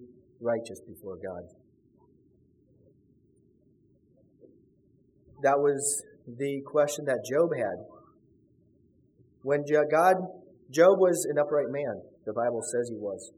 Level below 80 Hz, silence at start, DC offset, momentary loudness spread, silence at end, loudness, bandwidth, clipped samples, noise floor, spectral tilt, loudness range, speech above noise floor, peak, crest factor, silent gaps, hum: -74 dBFS; 0 s; under 0.1%; 18 LU; 0.1 s; -27 LUFS; 16 kHz; under 0.1%; -64 dBFS; -4.5 dB/octave; 14 LU; 37 dB; -8 dBFS; 22 dB; none; none